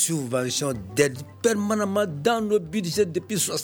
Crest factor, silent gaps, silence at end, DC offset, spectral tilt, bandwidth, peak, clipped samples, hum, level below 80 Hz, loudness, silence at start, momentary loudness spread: 18 dB; none; 0 s; under 0.1%; -4 dB/octave; over 20 kHz; -6 dBFS; under 0.1%; none; -58 dBFS; -24 LUFS; 0 s; 3 LU